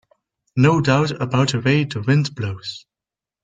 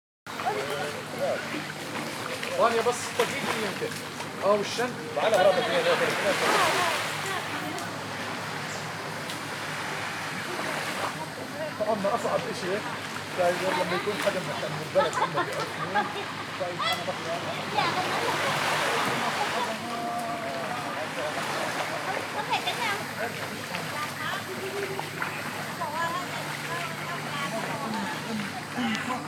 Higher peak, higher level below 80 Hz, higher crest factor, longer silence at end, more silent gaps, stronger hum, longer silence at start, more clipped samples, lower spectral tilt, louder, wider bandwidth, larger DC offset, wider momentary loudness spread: first, -2 dBFS vs -8 dBFS; first, -54 dBFS vs -72 dBFS; about the same, 18 dB vs 20 dB; first, 0.65 s vs 0 s; neither; neither; first, 0.55 s vs 0.25 s; neither; first, -6.5 dB/octave vs -3.5 dB/octave; first, -19 LUFS vs -29 LUFS; second, 9 kHz vs over 20 kHz; neither; first, 13 LU vs 9 LU